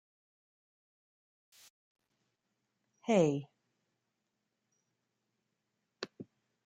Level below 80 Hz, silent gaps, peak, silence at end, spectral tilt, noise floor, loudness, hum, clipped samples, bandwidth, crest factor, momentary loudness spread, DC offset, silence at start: -82 dBFS; none; -16 dBFS; 0.45 s; -6.5 dB/octave; -85 dBFS; -32 LUFS; none; under 0.1%; 11.5 kHz; 26 dB; 24 LU; under 0.1%; 3.05 s